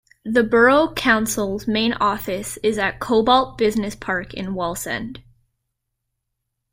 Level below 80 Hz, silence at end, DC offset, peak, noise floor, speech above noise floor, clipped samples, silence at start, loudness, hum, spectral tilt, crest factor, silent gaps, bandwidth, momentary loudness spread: -46 dBFS; 1.5 s; under 0.1%; -4 dBFS; -78 dBFS; 58 dB; under 0.1%; 0.25 s; -20 LUFS; none; -4 dB/octave; 18 dB; none; 16 kHz; 11 LU